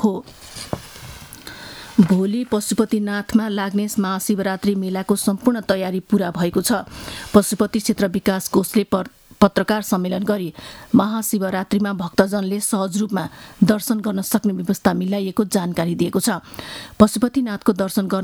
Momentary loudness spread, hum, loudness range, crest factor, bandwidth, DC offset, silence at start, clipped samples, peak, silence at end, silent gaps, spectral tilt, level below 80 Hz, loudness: 14 LU; none; 1 LU; 20 dB; 19 kHz; under 0.1%; 0 s; under 0.1%; 0 dBFS; 0 s; none; -5.5 dB/octave; -48 dBFS; -20 LUFS